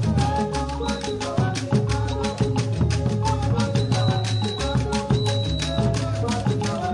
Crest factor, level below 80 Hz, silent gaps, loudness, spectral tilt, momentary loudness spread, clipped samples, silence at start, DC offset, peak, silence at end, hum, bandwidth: 14 dB; -34 dBFS; none; -23 LUFS; -6 dB/octave; 4 LU; under 0.1%; 0 s; under 0.1%; -8 dBFS; 0 s; none; 11.5 kHz